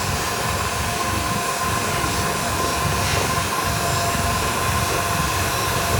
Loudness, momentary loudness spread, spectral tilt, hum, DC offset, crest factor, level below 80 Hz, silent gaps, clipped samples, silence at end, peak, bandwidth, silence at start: -21 LUFS; 2 LU; -3 dB/octave; none; under 0.1%; 14 dB; -34 dBFS; none; under 0.1%; 0 s; -6 dBFS; over 20 kHz; 0 s